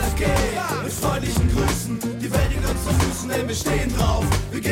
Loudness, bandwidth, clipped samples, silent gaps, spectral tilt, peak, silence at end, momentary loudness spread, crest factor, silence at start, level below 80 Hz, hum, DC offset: -22 LUFS; 17 kHz; under 0.1%; none; -5 dB/octave; -6 dBFS; 0 s; 4 LU; 16 dB; 0 s; -28 dBFS; none; under 0.1%